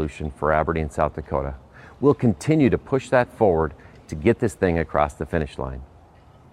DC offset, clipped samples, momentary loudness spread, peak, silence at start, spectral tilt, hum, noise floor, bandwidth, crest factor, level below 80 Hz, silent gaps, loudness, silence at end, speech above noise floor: under 0.1%; under 0.1%; 12 LU; -4 dBFS; 0 s; -7.5 dB/octave; none; -50 dBFS; 13 kHz; 18 dB; -38 dBFS; none; -22 LUFS; 0.7 s; 28 dB